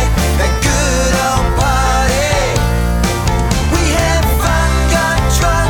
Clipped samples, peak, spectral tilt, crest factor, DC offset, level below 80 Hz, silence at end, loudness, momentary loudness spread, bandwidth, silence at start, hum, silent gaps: under 0.1%; 0 dBFS; -4.5 dB/octave; 12 dB; under 0.1%; -16 dBFS; 0 s; -13 LUFS; 2 LU; 19 kHz; 0 s; none; none